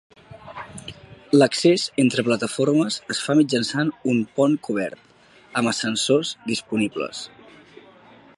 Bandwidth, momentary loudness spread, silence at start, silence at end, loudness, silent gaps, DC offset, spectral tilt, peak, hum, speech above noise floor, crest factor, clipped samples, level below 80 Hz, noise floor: 11.5 kHz; 18 LU; 0.3 s; 1.1 s; -21 LUFS; none; under 0.1%; -4.5 dB/octave; -4 dBFS; none; 28 dB; 18 dB; under 0.1%; -62 dBFS; -49 dBFS